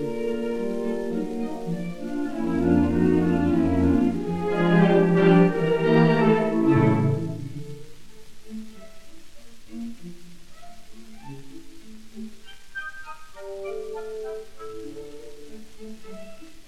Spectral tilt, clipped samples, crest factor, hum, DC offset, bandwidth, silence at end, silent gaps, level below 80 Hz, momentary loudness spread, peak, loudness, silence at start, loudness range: -8 dB/octave; under 0.1%; 18 dB; none; under 0.1%; 11.5 kHz; 0 s; none; -48 dBFS; 24 LU; -6 dBFS; -22 LUFS; 0 s; 23 LU